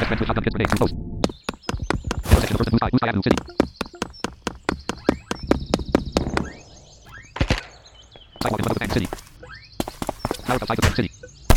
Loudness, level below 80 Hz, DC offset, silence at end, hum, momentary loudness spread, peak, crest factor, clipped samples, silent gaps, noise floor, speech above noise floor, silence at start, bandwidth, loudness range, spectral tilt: -24 LUFS; -30 dBFS; under 0.1%; 0 s; none; 13 LU; 0 dBFS; 24 dB; under 0.1%; none; -47 dBFS; 25 dB; 0 s; 19 kHz; 5 LU; -5.5 dB/octave